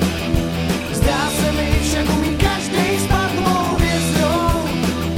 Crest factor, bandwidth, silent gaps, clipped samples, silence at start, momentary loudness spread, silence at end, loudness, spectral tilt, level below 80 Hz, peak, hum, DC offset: 16 dB; 17 kHz; none; under 0.1%; 0 s; 3 LU; 0 s; -18 LUFS; -5 dB/octave; -26 dBFS; -2 dBFS; none; under 0.1%